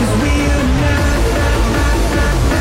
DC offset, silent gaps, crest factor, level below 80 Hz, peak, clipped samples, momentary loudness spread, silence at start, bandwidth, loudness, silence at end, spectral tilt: under 0.1%; none; 10 dB; -16 dBFS; -4 dBFS; under 0.1%; 1 LU; 0 s; 16 kHz; -15 LUFS; 0 s; -5.5 dB/octave